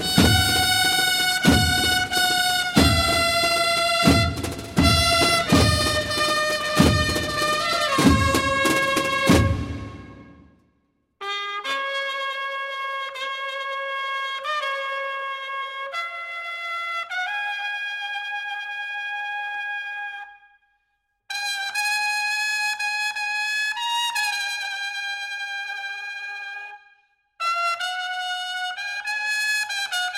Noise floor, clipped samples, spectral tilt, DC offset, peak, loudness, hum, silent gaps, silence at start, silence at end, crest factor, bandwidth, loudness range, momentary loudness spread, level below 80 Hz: -73 dBFS; under 0.1%; -3.5 dB/octave; under 0.1%; -2 dBFS; -22 LUFS; none; none; 0 s; 0 s; 22 dB; 16.5 kHz; 10 LU; 12 LU; -38 dBFS